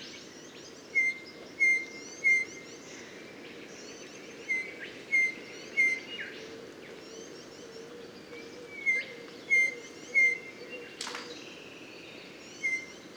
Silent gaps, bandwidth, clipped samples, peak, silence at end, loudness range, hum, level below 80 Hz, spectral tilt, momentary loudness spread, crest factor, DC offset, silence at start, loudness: none; over 20 kHz; under 0.1%; -16 dBFS; 0 s; 5 LU; none; -78 dBFS; -1.5 dB/octave; 21 LU; 18 dB; under 0.1%; 0 s; -28 LUFS